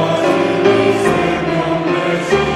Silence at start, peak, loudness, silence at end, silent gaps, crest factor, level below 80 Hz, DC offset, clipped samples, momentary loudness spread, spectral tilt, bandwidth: 0 s; 0 dBFS; -14 LUFS; 0 s; none; 14 dB; -42 dBFS; under 0.1%; under 0.1%; 4 LU; -5.5 dB/octave; 13 kHz